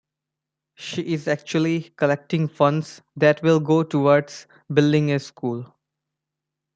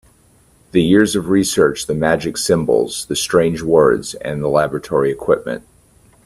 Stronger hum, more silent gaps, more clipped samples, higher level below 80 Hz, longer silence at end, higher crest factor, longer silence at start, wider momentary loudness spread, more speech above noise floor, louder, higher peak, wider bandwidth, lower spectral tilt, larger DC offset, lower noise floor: neither; neither; neither; second, -66 dBFS vs -46 dBFS; first, 1.1 s vs 0.65 s; about the same, 20 dB vs 16 dB; about the same, 0.8 s vs 0.75 s; first, 13 LU vs 7 LU; first, 64 dB vs 37 dB; second, -21 LUFS vs -16 LUFS; second, -4 dBFS vs 0 dBFS; second, 7.8 kHz vs 14.5 kHz; first, -7 dB/octave vs -5 dB/octave; neither; first, -85 dBFS vs -52 dBFS